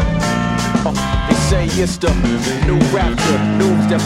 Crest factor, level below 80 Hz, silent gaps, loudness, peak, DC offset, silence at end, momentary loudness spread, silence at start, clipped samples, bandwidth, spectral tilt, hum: 14 dB; -24 dBFS; none; -16 LUFS; 0 dBFS; under 0.1%; 0 s; 3 LU; 0 s; under 0.1%; 15.5 kHz; -5.5 dB/octave; none